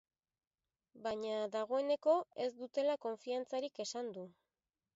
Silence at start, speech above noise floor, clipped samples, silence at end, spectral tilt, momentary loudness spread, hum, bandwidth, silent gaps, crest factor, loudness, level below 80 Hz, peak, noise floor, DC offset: 0.95 s; over 52 dB; under 0.1%; 0.65 s; -2.5 dB/octave; 11 LU; none; 7.6 kHz; none; 18 dB; -39 LUFS; -84 dBFS; -20 dBFS; under -90 dBFS; under 0.1%